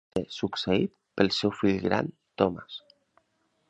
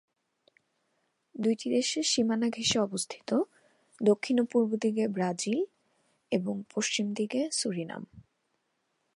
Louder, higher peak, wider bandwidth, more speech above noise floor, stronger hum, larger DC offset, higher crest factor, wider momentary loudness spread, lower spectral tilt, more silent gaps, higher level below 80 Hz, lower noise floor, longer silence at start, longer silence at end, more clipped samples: about the same, -28 LUFS vs -30 LUFS; first, -6 dBFS vs -12 dBFS; second, 10 kHz vs 11.5 kHz; about the same, 46 dB vs 49 dB; neither; neither; about the same, 24 dB vs 20 dB; first, 13 LU vs 9 LU; first, -6 dB/octave vs -4 dB/octave; neither; first, -56 dBFS vs -72 dBFS; second, -73 dBFS vs -78 dBFS; second, 0.15 s vs 1.35 s; about the same, 0.9 s vs 0.95 s; neither